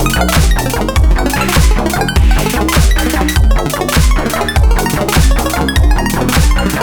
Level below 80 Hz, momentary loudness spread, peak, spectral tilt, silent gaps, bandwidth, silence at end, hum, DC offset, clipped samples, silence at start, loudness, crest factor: -12 dBFS; 2 LU; 0 dBFS; -4.5 dB/octave; none; over 20 kHz; 0 s; none; under 0.1%; under 0.1%; 0 s; -12 LUFS; 10 dB